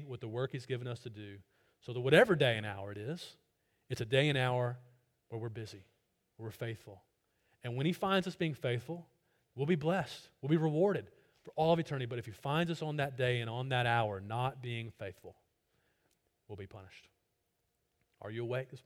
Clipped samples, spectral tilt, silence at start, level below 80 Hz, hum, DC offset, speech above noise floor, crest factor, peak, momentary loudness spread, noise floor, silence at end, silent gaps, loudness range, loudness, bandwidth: under 0.1%; -6.5 dB/octave; 0 s; -72 dBFS; none; under 0.1%; 47 dB; 26 dB; -12 dBFS; 19 LU; -82 dBFS; 0.05 s; none; 12 LU; -35 LUFS; 16 kHz